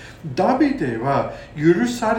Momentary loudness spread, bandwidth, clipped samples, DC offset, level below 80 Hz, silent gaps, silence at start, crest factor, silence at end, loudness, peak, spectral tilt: 7 LU; 16.5 kHz; under 0.1%; under 0.1%; -48 dBFS; none; 0 s; 16 dB; 0 s; -20 LUFS; -4 dBFS; -6.5 dB/octave